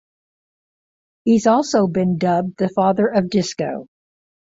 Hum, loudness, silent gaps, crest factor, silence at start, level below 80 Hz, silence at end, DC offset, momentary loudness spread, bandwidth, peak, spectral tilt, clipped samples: none; -18 LUFS; none; 16 dB; 1.25 s; -58 dBFS; 0.75 s; under 0.1%; 10 LU; 7.8 kHz; -2 dBFS; -6 dB/octave; under 0.1%